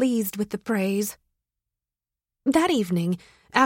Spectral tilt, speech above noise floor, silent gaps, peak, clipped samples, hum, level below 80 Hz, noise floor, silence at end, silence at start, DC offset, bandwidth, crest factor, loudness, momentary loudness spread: -5 dB/octave; 66 dB; none; -4 dBFS; under 0.1%; none; -62 dBFS; -90 dBFS; 0 s; 0 s; under 0.1%; 16.5 kHz; 22 dB; -25 LUFS; 9 LU